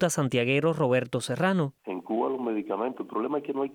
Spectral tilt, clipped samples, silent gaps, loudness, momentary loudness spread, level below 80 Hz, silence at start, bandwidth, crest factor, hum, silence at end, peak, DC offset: -5.5 dB/octave; under 0.1%; none; -28 LUFS; 7 LU; -70 dBFS; 0 s; 17.5 kHz; 16 dB; none; 0 s; -12 dBFS; under 0.1%